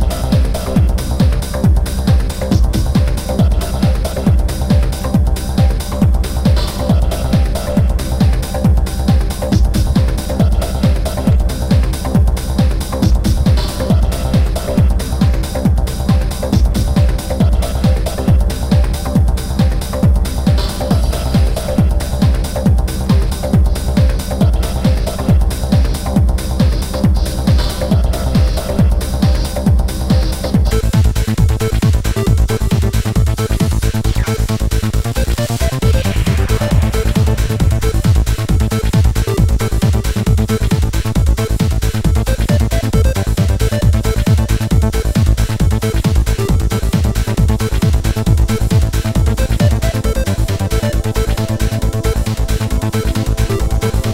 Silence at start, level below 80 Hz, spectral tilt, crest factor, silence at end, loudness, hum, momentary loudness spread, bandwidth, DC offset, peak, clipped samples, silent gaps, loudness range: 0 s; -16 dBFS; -6.5 dB/octave; 12 dB; 0 s; -15 LUFS; none; 2 LU; 16.5 kHz; under 0.1%; 0 dBFS; under 0.1%; none; 1 LU